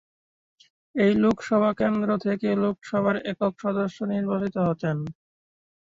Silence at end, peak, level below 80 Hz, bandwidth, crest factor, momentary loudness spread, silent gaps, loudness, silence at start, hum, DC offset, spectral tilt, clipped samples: 0.8 s; -10 dBFS; -60 dBFS; 7.6 kHz; 16 dB; 6 LU; none; -25 LUFS; 0.95 s; none; under 0.1%; -8 dB/octave; under 0.1%